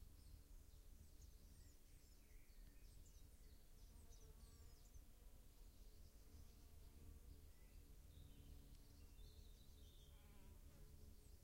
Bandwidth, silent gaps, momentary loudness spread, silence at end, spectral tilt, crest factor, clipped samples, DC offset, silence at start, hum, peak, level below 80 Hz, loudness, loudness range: 16 kHz; none; 3 LU; 0 s; -4.5 dB/octave; 14 dB; under 0.1%; under 0.1%; 0 s; none; -50 dBFS; -66 dBFS; -68 LUFS; 2 LU